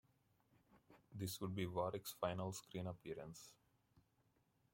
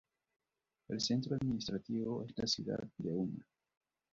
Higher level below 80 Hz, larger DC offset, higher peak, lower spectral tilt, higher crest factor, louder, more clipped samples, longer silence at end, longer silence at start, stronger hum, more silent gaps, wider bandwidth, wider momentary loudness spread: second, -78 dBFS vs -68 dBFS; neither; second, -26 dBFS vs -22 dBFS; about the same, -5.5 dB/octave vs -6 dB/octave; about the same, 22 dB vs 18 dB; second, -47 LUFS vs -39 LUFS; neither; about the same, 0.75 s vs 0.7 s; second, 0.75 s vs 0.9 s; neither; neither; first, 16.5 kHz vs 7.6 kHz; first, 14 LU vs 7 LU